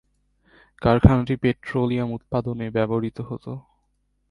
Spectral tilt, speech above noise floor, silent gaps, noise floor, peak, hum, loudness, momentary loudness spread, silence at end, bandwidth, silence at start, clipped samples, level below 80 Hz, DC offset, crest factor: -9.5 dB/octave; 48 dB; none; -69 dBFS; 0 dBFS; 50 Hz at -50 dBFS; -23 LUFS; 16 LU; 0.7 s; 10.5 kHz; 0.8 s; under 0.1%; -36 dBFS; under 0.1%; 24 dB